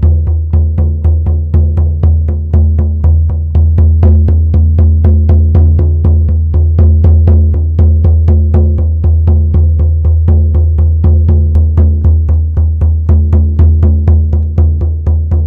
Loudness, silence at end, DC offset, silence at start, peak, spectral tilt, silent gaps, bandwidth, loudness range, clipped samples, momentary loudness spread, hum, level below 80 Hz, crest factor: -9 LUFS; 0 s; under 0.1%; 0 s; 0 dBFS; -12.5 dB/octave; none; 1.6 kHz; 2 LU; under 0.1%; 4 LU; none; -10 dBFS; 6 dB